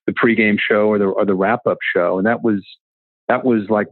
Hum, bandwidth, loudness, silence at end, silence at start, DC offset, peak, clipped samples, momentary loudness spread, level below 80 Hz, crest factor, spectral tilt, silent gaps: none; 4.3 kHz; -17 LUFS; 0.05 s; 0.05 s; under 0.1%; 0 dBFS; under 0.1%; 6 LU; -66 dBFS; 16 dB; -10 dB/octave; 2.80-3.28 s